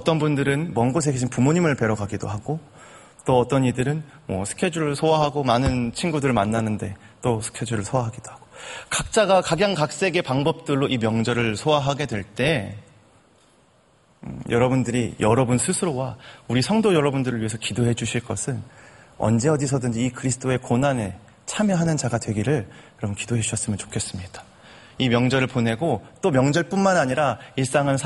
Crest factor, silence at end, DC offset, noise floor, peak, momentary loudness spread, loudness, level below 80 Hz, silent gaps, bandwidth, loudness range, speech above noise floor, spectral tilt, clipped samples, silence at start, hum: 20 dB; 0 s; under 0.1%; -58 dBFS; -4 dBFS; 12 LU; -22 LUFS; -48 dBFS; none; 11.5 kHz; 4 LU; 36 dB; -5.5 dB/octave; under 0.1%; 0 s; none